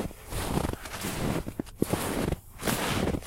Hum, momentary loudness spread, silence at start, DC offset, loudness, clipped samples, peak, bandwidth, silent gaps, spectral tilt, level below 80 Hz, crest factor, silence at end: none; 7 LU; 0 s; under 0.1%; -31 LUFS; under 0.1%; -10 dBFS; 16 kHz; none; -4.5 dB/octave; -40 dBFS; 22 dB; 0 s